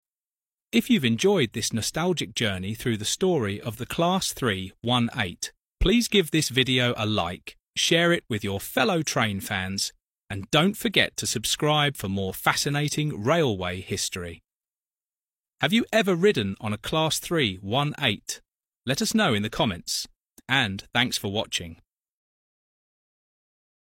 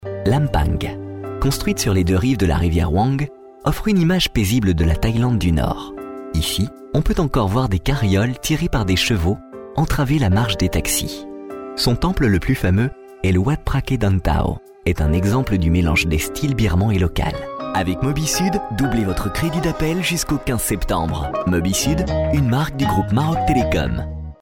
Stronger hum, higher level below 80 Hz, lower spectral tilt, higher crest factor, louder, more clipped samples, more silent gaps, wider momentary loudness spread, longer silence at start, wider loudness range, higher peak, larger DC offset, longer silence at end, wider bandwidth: neither; second, -46 dBFS vs -28 dBFS; second, -4 dB/octave vs -5.5 dB/octave; first, 22 dB vs 14 dB; second, -24 LUFS vs -19 LUFS; neither; first, 7.70-7.74 s, 10.24-10.28 s, 14.56-14.60 s, 15.39-15.44 s, 20.16-20.20 s, 20.27-20.31 s vs none; about the same, 9 LU vs 7 LU; first, 0.75 s vs 0 s; about the same, 4 LU vs 2 LU; about the same, -4 dBFS vs -6 dBFS; neither; first, 2.25 s vs 0.1 s; about the same, 16.5 kHz vs 17.5 kHz